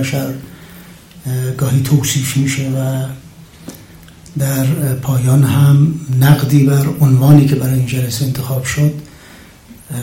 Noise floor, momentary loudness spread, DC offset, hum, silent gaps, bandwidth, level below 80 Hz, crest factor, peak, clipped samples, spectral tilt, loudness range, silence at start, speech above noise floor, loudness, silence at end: -39 dBFS; 18 LU; under 0.1%; none; none; 17 kHz; -42 dBFS; 14 dB; 0 dBFS; 0.1%; -6 dB/octave; 6 LU; 0 s; 27 dB; -13 LUFS; 0 s